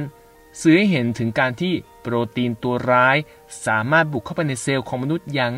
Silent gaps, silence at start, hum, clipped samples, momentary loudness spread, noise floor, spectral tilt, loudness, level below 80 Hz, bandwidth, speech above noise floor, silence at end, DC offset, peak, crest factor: none; 0 s; none; under 0.1%; 9 LU; -39 dBFS; -5.5 dB/octave; -20 LUFS; -56 dBFS; 15.5 kHz; 19 dB; 0 s; under 0.1%; -2 dBFS; 18 dB